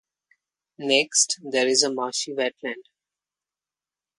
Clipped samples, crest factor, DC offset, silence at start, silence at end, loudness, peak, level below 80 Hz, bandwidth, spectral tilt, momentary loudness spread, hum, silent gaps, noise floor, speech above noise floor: under 0.1%; 22 dB; under 0.1%; 0.8 s; 1.4 s; -22 LUFS; -4 dBFS; -76 dBFS; 11.5 kHz; -0.5 dB/octave; 14 LU; 50 Hz at -75 dBFS; none; under -90 dBFS; over 66 dB